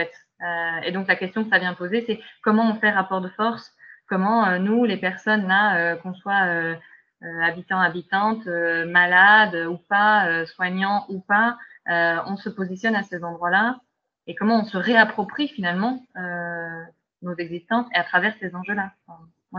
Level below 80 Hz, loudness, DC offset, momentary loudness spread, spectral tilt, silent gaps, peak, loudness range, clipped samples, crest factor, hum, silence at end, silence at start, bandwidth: -72 dBFS; -21 LUFS; under 0.1%; 14 LU; -6.5 dB/octave; none; -2 dBFS; 6 LU; under 0.1%; 20 dB; none; 0 s; 0 s; 7 kHz